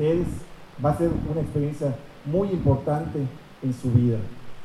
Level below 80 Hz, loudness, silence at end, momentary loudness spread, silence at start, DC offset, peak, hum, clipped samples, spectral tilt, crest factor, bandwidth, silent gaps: -44 dBFS; -25 LUFS; 0 s; 11 LU; 0 s; under 0.1%; -6 dBFS; none; under 0.1%; -9 dB/octave; 18 dB; 12.5 kHz; none